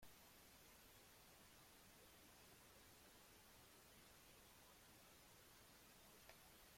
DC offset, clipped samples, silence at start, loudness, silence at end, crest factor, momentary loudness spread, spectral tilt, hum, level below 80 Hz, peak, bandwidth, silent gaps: under 0.1%; under 0.1%; 0 s; -66 LUFS; 0 s; 20 dB; 1 LU; -2.5 dB/octave; none; -80 dBFS; -48 dBFS; 16.5 kHz; none